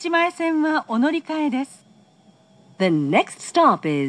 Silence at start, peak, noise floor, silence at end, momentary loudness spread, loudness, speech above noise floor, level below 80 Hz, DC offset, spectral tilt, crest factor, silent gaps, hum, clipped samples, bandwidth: 0 s; -4 dBFS; -54 dBFS; 0 s; 7 LU; -20 LUFS; 34 dB; -82 dBFS; under 0.1%; -5.5 dB/octave; 18 dB; none; none; under 0.1%; 11 kHz